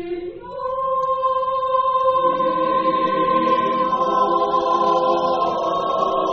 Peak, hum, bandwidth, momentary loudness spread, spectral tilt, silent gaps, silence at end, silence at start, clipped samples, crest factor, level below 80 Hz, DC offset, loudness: -6 dBFS; none; 6.6 kHz; 5 LU; -6 dB/octave; none; 0 s; 0 s; under 0.1%; 12 dB; -54 dBFS; under 0.1%; -19 LUFS